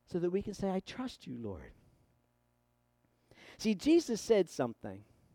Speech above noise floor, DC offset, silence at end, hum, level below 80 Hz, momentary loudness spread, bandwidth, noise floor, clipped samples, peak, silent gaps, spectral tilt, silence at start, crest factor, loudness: 42 dB; under 0.1%; 0.3 s; 60 Hz at -70 dBFS; -64 dBFS; 18 LU; 16 kHz; -76 dBFS; under 0.1%; -16 dBFS; none; -5.5 dB/octave; 0.1 s; 20 dB; -34 LUFS